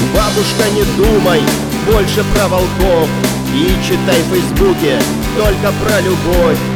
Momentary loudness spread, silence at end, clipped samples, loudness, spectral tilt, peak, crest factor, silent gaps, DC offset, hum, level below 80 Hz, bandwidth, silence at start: 3 LU; 0 s; under 0.1%; -12 LUFS; -5 dB/octave; 0 dBFS; 12 dB; none; 0.3%; none; -22 dBFS; over 20 kHz; 0 s